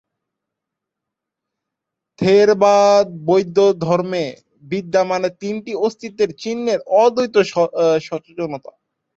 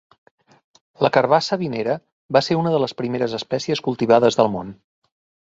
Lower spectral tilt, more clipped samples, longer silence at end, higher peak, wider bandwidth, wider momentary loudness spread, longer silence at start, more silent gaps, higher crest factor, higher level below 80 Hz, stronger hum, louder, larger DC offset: about the same, -5.5 dB/octave vs -5.5 dB/octave; neither; about the same, 0.6 s vs 0.7 s; about the same, -2 dBFS vs -2 dBFS; about the same, 8 kHz vs 7.8 kHz; first, 14 LU vs 9 LU; first, 2.2 s vs 1 s; second, none vs 2.12-2.29 s; about the same, 16 dB vs 20 dB; about the same, -62 dBFS vs -60 dBFS; neither; first, -17 LUFS vs -20 LUFS; neither